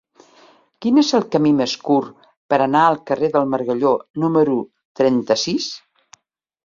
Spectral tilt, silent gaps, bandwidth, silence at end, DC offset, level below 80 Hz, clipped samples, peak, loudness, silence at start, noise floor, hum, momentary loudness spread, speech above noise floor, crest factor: -5 dB/octave; 2.37-2.49 s, 4.10-4.14 s, 4.85-4.95 s; 7.6 kHz; 0.85 s; under 0.1%; -62 dBFS; under 0.1%; -2 dBFS; -18 LUFS; 0.8 s; -52 dBFS; none; 9 LU; 35 dB; 18 dB